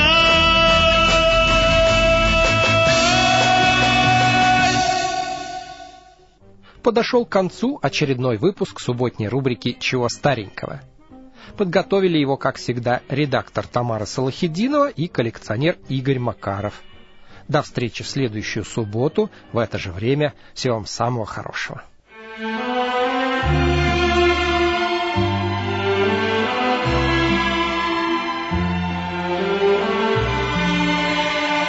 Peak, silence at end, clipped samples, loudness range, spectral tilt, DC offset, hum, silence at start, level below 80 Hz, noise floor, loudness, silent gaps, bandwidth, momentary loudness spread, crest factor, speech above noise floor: -4 dBFS; 0 s; under 0.1%; 9 LU; -4.5 dB/octave; under 0.1%; none; 0 s; -34 dBFS; -48 dBFS; -19 LUFS; none; 8 kHz; 11 LU; 16 dB; 27 dB